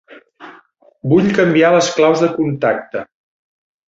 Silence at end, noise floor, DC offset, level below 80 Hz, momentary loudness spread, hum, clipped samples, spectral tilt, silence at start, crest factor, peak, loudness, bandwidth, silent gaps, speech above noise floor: 0.85 s; -48 dBFS; under 0.1%; -54 dBFS; 14 LU; none; under 0.1%; -5.5 dB/octave; 0.1 s; 14 dB; -2 dBFS; -14 LUFS; 7.8 kHz; none; 35 dB